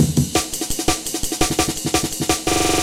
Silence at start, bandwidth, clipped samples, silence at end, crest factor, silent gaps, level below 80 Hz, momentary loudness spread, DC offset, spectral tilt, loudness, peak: 0 s; 17 kHz; under 0.1%; 0 s; 18 dB; none; -34 dBFS; 4 LU; under 0.1%; -3.5 dB/octave; -20 LUFS; -2 dBFS